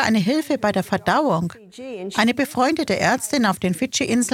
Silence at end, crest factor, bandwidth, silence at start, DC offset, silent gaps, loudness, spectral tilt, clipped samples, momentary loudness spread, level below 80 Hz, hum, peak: 0 s; 18 dB; 16.5 kHz; 0 s; under 0.1%; none; -20 LUFS; -4.5 dB/octave; under 0.1%; 7 LU; -56 dBFS; none; -2 dBFS